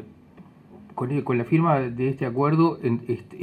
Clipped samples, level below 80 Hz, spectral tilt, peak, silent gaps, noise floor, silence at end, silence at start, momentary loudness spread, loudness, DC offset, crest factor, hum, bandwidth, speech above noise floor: under 0.1%; -62 dBFS; -10 dB/octave; -6 dBFS; none; -49 dBFS; 0 s; 0 s; 10 LU; -24 LUFS; under 0.1%; 18 dB; none; 8.6 kHz; 26 dB